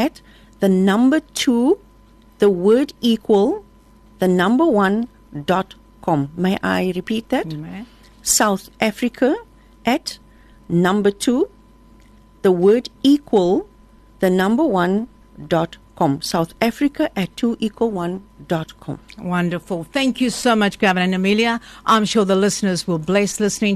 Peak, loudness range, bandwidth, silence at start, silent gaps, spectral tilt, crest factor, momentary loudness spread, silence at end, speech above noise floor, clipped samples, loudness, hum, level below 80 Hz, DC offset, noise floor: -2 dBFS; 5 LU; 13.5 kHz; 0 s; none; -5 dB/octave; 16 dB; 10 LU; 0 s; 31 dB; under 0.1%; -19 LUFS; none; -50 dBFS; under 0.1%; -48 dBFS